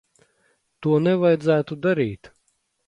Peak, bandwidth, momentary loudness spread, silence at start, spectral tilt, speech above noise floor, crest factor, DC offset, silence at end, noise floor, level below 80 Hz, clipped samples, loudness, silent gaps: -6 dBFS; 10.5 kHz; 10 LU; 0.8 s; -8.5 dB/octave; 50 dB; 16 dB; under 0.1%; 0.6 s; -70 dBFS; -60 dBFS; under 0.1%; -21 LUFS; none